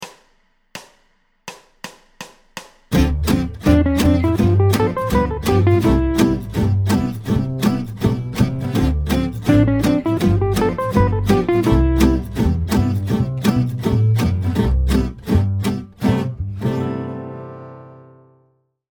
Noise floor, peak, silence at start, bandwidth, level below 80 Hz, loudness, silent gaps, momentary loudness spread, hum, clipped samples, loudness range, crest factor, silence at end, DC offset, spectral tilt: -61 dBFS; 0 dBFS; 0 s; over 20 kHz; -26 dBFS; -18 LUFS; none; 21 LU; none; under 0.1%; 6 LU; 18 dB; 0.95 s; under 0.1%; -7 dB/octave